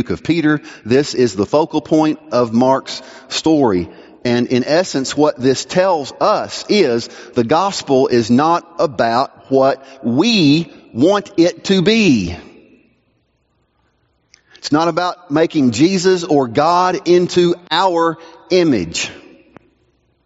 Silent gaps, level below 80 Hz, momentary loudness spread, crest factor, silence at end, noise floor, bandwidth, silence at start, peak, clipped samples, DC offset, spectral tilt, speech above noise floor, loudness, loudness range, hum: none; -52 dBFS; 8 LU; 16 dB; 1.1 s; -63 dBFS; 8 kHz; 0 s; 0 dBFS; under 0.1%; under 0.1%; -4.5 dB/octave; 48 dB; -15 LUFS; 4 LU; none